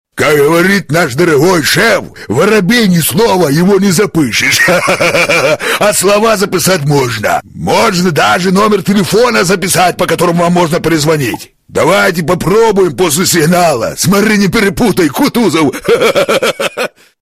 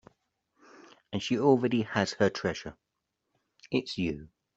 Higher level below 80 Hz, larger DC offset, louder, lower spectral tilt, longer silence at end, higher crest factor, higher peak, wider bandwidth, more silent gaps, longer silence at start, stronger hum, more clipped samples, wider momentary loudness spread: first, -38 dBFS vs -62 dBFS; neither; first, -9 LUFS vs -29 LUFS; about the same, -4.5 dB/octave vs -5.5 dB/octave; about the same, 0.35 s vs 0.3 s; second, 10 dB vs 22 dB; first, 0 dBFS vs -10 dBFS; first, 16 kHz vs 8.2 kHz; neither; second, 0.15 s vs 1.1 s; neither; neither; second, 5 LU vs 15 LU